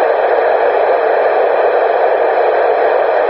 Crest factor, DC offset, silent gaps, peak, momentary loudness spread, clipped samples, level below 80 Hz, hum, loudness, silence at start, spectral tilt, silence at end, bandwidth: 12 dB; under 0.1%; none; 0 dBFS; 0 LU; under 0.1%; -58 dBFS; none; -12 LUFS; 0 s; -0.5 dB/octave; 0 s; 5.6 kHz